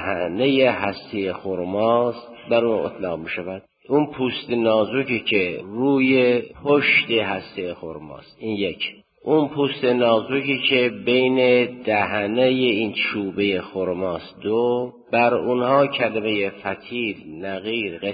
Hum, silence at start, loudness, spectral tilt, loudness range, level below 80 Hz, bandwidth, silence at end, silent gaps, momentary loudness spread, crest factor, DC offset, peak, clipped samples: none; 0 s; -21 LUFS; -10 dB/octave; 4 LU; -56 dBFS; 5 kHz; 0 s; none; 12 LU; 18 dB; under 0.1%; -4 dBFS; under 0.1%